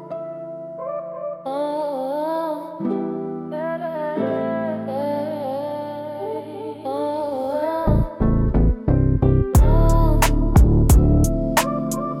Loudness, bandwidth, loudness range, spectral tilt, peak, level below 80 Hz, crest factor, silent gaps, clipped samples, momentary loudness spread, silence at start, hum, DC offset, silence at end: -21 LUFS; 17.5 kHz; 9 LU; -7 dB/octave; -4 dBFS; -24 dBFS; 14 dB; none; under 0.1%; 13 LU; 0 s; none; under 0.1%; 0 s